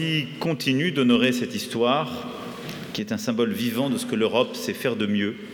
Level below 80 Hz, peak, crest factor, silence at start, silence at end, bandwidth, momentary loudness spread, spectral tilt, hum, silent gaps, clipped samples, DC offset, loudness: -66 dBFS; -6 dBFS; 18 dB; 0 s; 0 s; 19 kHz; 12 LU; -5 dB/octave; none; none; under 0.1%; under 0.1%; -24 LUFS